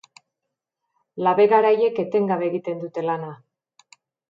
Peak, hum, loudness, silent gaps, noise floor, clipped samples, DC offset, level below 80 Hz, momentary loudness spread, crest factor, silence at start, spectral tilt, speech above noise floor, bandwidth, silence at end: -4 dBFS; none; -21 LUFS; none; -83 dBFS; under 0.1%; under 0.1%; -78 dBFS; 13 LU; 20 dB; 1.15 s; -7.5 dB/octave; 63 dB; 7.4 kHz; 0.95 s